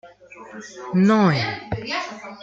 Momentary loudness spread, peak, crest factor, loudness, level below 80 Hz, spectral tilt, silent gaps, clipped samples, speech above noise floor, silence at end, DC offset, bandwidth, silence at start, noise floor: 22 LU; -4 dBFS; 18 dB; -21 LUFS; -54 dBFS; -6.5 dB/octave; none; under 0.1%; 22 dB; 0 s; under 0.1%; 7.6 kHz; 0.05 s; -43 dBFS